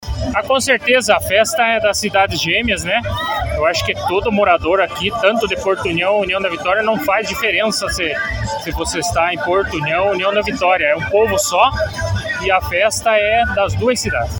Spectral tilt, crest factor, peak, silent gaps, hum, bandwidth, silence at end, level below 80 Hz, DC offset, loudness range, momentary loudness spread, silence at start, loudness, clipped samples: -3.5 dB/octave; 16 dB; 0 dBFS; none; none; 17.5 kHz; 0 s; -34 dBFS; under 0.1%; 2 LU; 6 LU; 0 s; -16 LUFS; under 0.1%